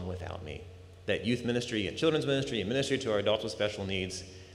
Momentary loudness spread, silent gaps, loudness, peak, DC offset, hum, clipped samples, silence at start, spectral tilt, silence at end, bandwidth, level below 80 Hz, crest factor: 13 LU; none; -32 LUFS; -14 dBFS; under 0.1%; none; under 0.1%; 0 s; -5 dB/octave; 0 s; 13.5 kHz; -60 dBFS; 18 dB